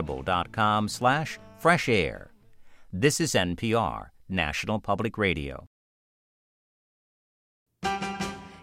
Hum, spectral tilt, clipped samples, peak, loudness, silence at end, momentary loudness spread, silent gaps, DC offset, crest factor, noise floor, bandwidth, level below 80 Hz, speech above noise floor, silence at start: none; -4.5 dB/octave; under 0.1%; -8 dBFS; -27 LUFS; 0 s; 12 LU; 5.67-7.66 s; under 0.1%; 22 dB; -50 dBFS; 16.5 kHz; -50 dBFS; 23 dB; 0 s